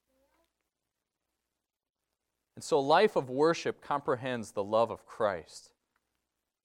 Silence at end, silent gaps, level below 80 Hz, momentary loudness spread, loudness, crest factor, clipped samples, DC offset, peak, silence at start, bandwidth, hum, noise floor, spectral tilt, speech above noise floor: 1.05 s; none; -74 dBFS; 11 LU; -30 LUFS; 22 dB; under 0.1%; under 0.1%; -10 dBFS; 2.55 s; 13.5 kHz; none; -88 dBFS; -5 dB/octave; 58 dB